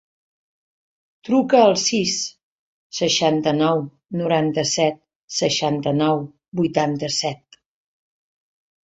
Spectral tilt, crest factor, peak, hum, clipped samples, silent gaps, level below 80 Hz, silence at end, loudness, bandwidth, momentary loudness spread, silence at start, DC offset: -4 dB/octave; 20 dB; -2 dBFS; none; under 0.1%; 2.43-2.90 s, 5.16-5.28 s, 6.48-6.52 s; -62 dBFS; 1.5 s; -20 LUFS; 8.4 kHz; 12 LU; 1.25 s; under 0.1%